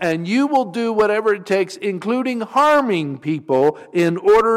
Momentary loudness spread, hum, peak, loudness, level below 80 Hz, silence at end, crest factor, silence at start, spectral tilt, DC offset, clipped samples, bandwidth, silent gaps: 7 LU; none; -6 dBFS; -18 LUFS; -56 dBFS; 0 s; 10 dB; 0 s; -6 dB/octave; under 0.1%; under 0.1%; 14.5 kHz; none